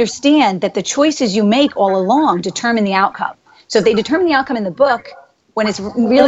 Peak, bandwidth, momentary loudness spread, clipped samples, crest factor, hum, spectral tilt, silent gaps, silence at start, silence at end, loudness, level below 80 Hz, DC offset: 0 dBFS; 8.2 kHz; 6 LU; under 0.1%; 14 dB; none; -4.5 dB/octave; none; 0 s; 0 s; -15 LUFS; -54 dBFS; under 0.1%